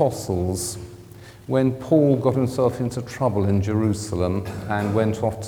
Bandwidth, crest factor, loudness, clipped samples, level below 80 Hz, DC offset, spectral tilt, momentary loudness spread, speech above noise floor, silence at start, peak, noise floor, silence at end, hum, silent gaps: 18 kHz; 18 dB; -22 LUFS; under 0.1%; -50 dBFS; under 0.1%; -7 dB/octave; 9 LU; 21 dB; 0 s; -4 dBFS; -43 dBFS; 0 s; none; none